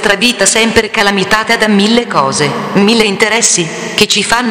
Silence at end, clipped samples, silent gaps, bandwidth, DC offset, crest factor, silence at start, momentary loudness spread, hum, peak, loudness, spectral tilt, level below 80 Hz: 0 s; 0.7%; none; over 20 kHz; under 0.1%; 10 dB; 0 s; 4 LU; none; 0 dBFS; -9 LUFS; -2.5 dB/octave; -40 dBFS